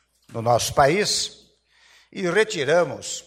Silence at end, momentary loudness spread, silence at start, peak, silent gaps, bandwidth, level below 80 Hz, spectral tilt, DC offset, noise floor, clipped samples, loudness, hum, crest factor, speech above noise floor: 0.05 s; 11 LU; 0.3 s; -4 dBFS; none; 16 kHz; -52 dBFS; -3.5 dB/octave; under 0.1%; -58 dBFS; under 0.1%; -21 LUFS; none; 20 dB; 36 dB